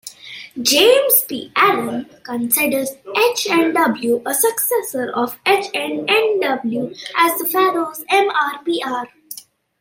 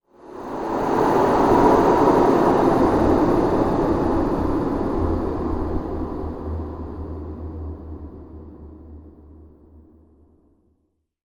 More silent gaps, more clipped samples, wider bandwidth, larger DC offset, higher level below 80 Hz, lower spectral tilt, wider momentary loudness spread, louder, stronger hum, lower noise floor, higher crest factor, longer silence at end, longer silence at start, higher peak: neither; neither; second, 16.5 kHz vs over 20 kHz; neither; second, -64 dBFS vs -36 dBFS; second, -2 dB/octave vs -8 dB/octave; second, 13 LU vs 21 LU; first, -17 LUFS vs -20 LUFS; neither; second, -38 dBFS vs -69 dBFS; about the same, 18 dB vs 18 dB; second, 0.4 s vs 1.8 s; second, 0.05 s vs 0.25 s; first, 0 dBFS vs -4 dBFS